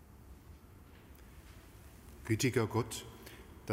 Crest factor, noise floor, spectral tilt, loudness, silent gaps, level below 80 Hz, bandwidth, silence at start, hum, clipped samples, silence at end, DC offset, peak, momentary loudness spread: 22 dB; -57 dBFS; -5 dB/octave; -35 LUFS; none; -58 dBFS; 16 kHz; 0 s; none; under 0.1%; 0 s; under 0.1%; -18 dBFS; 25 LU